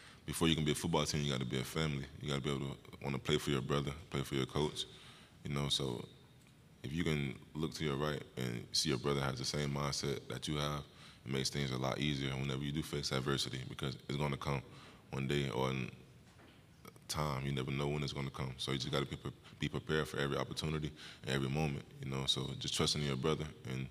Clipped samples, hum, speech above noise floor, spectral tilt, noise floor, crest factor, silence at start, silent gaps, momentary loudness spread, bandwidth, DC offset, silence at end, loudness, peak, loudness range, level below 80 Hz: under 0.1%; none; 24 dB; -4.5 dB/octave; -62 dBFS; 22 dB; 0 s; none; 10 LU; 15.5 kHz; under 0.1%; 0 s; -38 LUFS; -16 dBFS; 3 LU; -56 dBFS